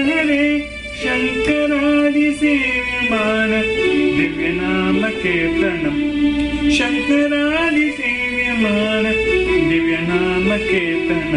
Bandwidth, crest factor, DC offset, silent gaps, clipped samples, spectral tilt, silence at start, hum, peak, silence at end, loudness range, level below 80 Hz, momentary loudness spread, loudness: 11 kHz; 12 dB; under 0.1%; none; under 0.1%; -5.5 dB/octave; 0 s; none; -6 dBFS; 0 s; 1 LU; -36 dBFS; 3 LU; -16 LUFS